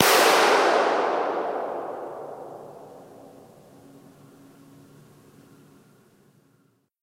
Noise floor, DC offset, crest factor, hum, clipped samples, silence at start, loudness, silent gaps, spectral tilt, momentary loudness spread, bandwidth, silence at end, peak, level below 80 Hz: -65 dBFS; under 0.1%; 26 dB; none; under 0.1%; 0 s; -21 LUFS; none; -1.5 dB/octave; 27 LU; 16 kHz; 3.75 s; 0 dBFS; -78 dBFS